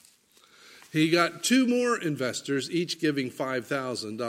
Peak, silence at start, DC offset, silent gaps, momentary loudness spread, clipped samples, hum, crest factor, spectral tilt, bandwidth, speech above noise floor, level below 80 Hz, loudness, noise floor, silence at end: -8 dBFS; 0.7 s; under 0.1%; none; 8 LU; under 0.1%; none; 20 dB; -4 dB/octave; 16 kHz; 33 dB; -76 dBFS; -27 LUFS; -60 dBFS; 0 s